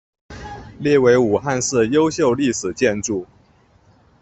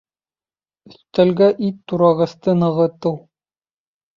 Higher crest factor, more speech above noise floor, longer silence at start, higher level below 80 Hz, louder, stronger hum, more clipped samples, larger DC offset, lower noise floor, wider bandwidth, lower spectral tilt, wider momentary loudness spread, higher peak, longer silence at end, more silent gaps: about the same, 16 dB vs 16 dB; second, 37 dB vs over 73 dB; second, 0.3 s vs 1.15 s; first, -50 dBFS vs -60 dBFS; about the same, -18 LUFS vs -17 LUFS; neither; neither; neither; second, -54 dBFS vs under -90 dBFS; first, 8.4 kHz vs 7.2 kHz; second, -4.5 dB/octave vs -9 dB/octave; first, 20 LU vs 10 LU; about the same, -2 dBFS vs -2 dBFS; about the same, 1 s vs 1 s; neither